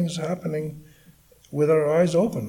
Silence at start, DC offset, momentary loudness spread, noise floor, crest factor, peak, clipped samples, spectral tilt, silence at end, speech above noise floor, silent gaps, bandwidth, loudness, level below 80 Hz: 0 s; under 0.1%; 13 LU; -54 dBFS; 16 dB; -8 dBFS; under 0.1%; -7 dB/octave; 0 s; 32 dB; none; 17 kHz; -23 LUFS; -58 dBFS